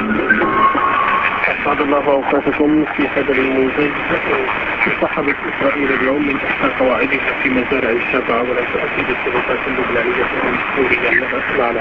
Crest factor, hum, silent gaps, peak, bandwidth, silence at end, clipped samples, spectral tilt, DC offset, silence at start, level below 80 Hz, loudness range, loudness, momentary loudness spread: 16 dB; none; none; 0 dBFS; 7 kHz; 0 s; under 0.1%; -7 dB/octave; under 0.1%; 0 s; -42 dBFS; 2 LU; -15 LUFS; 4 LU